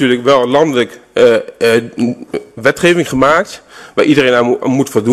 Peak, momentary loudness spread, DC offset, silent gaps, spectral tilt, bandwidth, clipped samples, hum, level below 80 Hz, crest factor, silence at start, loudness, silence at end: 0 dBFS; 9 LU; under 0.1%; none; -5 dB/octave; 13.5 kHz; under 0.1%; none; -48 dBFS; 12 dB; 0 s; -12 LUFS; 0 s